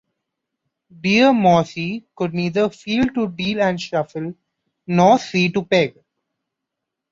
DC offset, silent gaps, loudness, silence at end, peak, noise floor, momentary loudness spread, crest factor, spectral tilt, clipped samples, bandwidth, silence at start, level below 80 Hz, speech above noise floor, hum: under 0.1%; none; -18 LUFS; 1.2 s; -2 dBFS; -82 dBFS; 12 LU; 18 dB; -6 dB/octave; under 0.1%; 7.6 kHz; 1.05 s; -54 dBFS; 64 dB; none